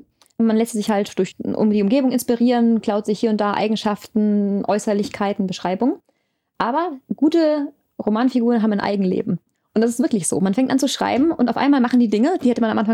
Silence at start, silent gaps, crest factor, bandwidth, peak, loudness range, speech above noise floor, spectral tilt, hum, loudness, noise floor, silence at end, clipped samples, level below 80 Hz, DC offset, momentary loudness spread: 0.4 s; none; 14 dB; 14.5 kHz; -6 dBFS; 3 LU; 50 dB; -5.5 dB/octave; none; -19 LUFS; -68 dBFS; 0 s; under 0.1%; -62 dBFS; under 0.1%; 7 LU